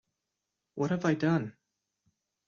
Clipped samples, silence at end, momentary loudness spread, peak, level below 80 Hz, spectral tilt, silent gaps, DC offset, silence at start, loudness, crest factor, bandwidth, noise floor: under 0.1%; 0.95 s; 15 LU; -14 dBFS; -70 dBFS; -7 dB/octave; none; under 0.1%; 0.75 s; -30 LUFS; 20 dB; 7.2 kHz; -86 dBFS